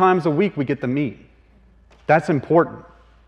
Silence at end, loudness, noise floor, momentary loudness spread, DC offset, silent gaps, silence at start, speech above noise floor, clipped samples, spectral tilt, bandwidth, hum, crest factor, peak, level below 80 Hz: 0.45 s; -20 LUFS; -52 dBFS; 10 LU; under 0.1%; none; 0 s; 33 dB; under 0.1%; -8.5 dB/octave; 9.6 kHz; none; 18 dB; -2 dBFS; -54 dBFS